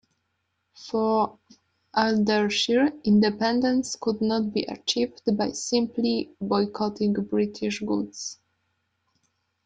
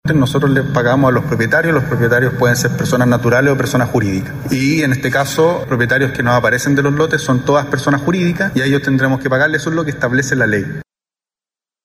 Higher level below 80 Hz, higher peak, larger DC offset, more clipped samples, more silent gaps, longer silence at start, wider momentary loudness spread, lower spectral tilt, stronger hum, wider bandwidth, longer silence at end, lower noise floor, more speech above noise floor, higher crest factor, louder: second, -64 dBFS vs -42 dBFS; second, -6 dBFS vs -2 dBFS; neither; neither; neither; first, 0.8 s vs 0.05 s; first, 8 LU vs 4 LU; second, -4.5 dB/octave vs -6 dB/octave; neither; second, 9.2 kHz vs 16 kHz; first, 1.35 s vs 1 s; second, -76 dBFS vs under -90 dBFS; second, 52 dB vs over 76 dB; first, 18 dB vs 12 dB; second, -25 LUFS vs -14 LUFS